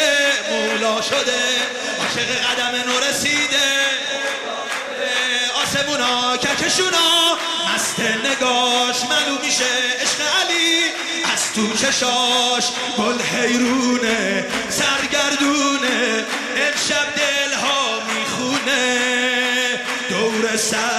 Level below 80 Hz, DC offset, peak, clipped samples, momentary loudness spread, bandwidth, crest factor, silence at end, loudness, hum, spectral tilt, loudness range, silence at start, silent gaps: -58 dBFS; under 0.1%; -4 dBFS; under 0.1%; 5 LU; 13.5 kHz; 14 dB; 0 s; -17 LUFS; none; -1 dB/octave; 2 LU; 0 s; none